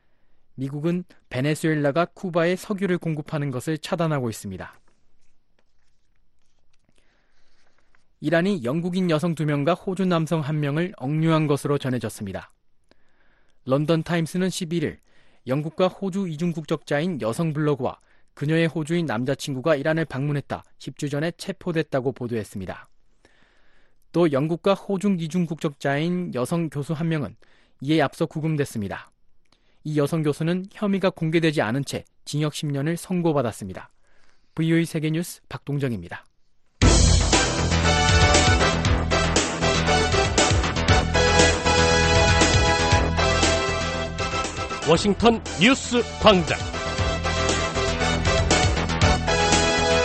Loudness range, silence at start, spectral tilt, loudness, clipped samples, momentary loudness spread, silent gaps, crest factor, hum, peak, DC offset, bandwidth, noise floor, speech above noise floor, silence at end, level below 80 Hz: 9 LU; 0.55 s; -4.5 dB/octave; -22 LUFS; under 0.1%; 13 LU; none; 20 dB; none; -2 dBFS; under 0.1%; 12.5 kHz; -57 dBFS; 33 dB; 0 s; -34 dBFS